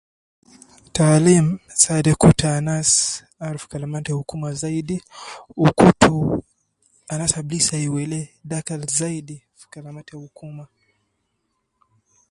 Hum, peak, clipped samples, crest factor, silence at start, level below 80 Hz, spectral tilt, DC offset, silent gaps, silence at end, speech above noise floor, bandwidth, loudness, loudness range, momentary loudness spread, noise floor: none; 0 dBFS; under 0.1%; 20 dB; 0.95 s; -46 dBFS; -4.5 dB/octave; under 0.1%; none; 1.65 s; 53 dB; 11.5 kHz; -19 LUFS; 12 LU; 24 LU; -73 dBFS